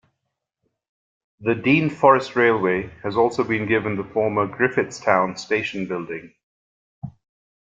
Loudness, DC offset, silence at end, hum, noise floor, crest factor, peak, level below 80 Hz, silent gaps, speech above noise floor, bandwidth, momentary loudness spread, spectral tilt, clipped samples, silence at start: -21 LUFS; under 0.1%; 0.7 s; none; -79 dBFS; 20 dB; -2 dBFS; -60 dBFS; 6.43-7.02 s; 59 dB; 7.8 kHz; 15 LU; -6 dB/octave; under 0.1%; 1.4 s